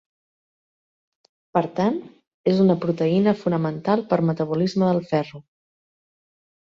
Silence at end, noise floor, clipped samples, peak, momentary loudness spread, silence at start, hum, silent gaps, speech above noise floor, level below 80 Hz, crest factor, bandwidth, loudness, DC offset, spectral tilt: 1.25 s; under -90 dBFS; under 0.1%; -4 dBFS; 6 LU; 1.55 s; none; 2.27-2.44 s; over 69 dB; -62 dBFS; 18 dB; 7.2 kHz; -22 LUFS; under 0.1%; -8.5 dB/octave